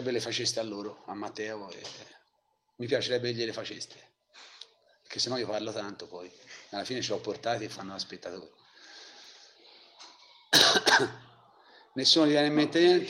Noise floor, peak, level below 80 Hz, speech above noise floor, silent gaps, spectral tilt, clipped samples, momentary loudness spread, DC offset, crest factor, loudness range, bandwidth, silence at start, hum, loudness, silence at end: -75 dBFS; -6 dBFS; -74 dBFS; 45 dB; none; -3 dB/octave; under 0.1%; 25 LU; under 0.1%; 24 dB; 12 LU; 15.5 kHz; 0 s; none; -27 LUFS; 0 s